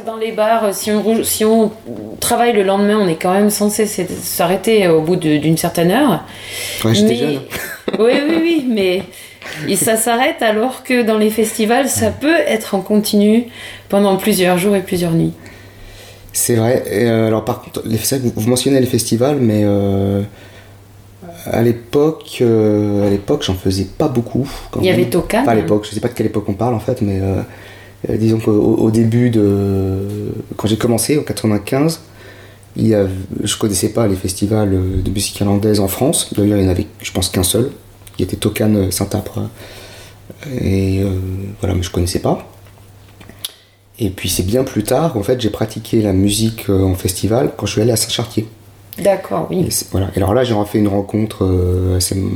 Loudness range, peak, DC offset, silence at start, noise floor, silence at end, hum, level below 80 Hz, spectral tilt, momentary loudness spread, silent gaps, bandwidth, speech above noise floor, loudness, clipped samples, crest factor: 5 LU; -2 dBFS; under 0.1%; 0 s; -45 dBFS; 0 s; none; -40 dBFS; -5 dB/octave; 10 LU; none; 19.5 kHz; 30 dB; -15 LUFS; under 0.1%; 14 dB